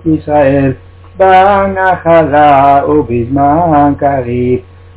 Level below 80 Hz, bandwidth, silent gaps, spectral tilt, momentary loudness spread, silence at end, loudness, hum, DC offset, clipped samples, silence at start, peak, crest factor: -32 dBFS; 4 kHz; none; -11 dB/octave; 8 LU; 0.35 s; -9 LUFS; none; under 0.1%; 0.7%; 0.05 s; 0 dBFS; 8 dB